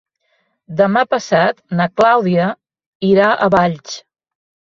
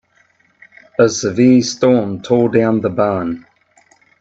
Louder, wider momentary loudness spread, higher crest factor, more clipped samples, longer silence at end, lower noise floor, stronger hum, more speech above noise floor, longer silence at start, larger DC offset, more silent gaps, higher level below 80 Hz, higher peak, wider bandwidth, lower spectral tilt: about the same, -14 LUFS vs -15 LUFS; first, 15 LU vs 11 LU; about the same, 16 dB vs 16 dB; neither; about the same, 0.7 s vs 0.8 s; first, -65 dBFS vs -56 dBFS; neither; first, 51 dB vs 43 dB; second, 0.7 s vs 1 s; neither; first, 2.86-3.00 s vs none; about the same, -54 dBFS vs -56 dBFS; about the same, 0 dBFS vs 0 dBFS; about the same, 7.4 kHz vs 8 kHz; about the same, -6 dB/octave vs -5.5 dB/octave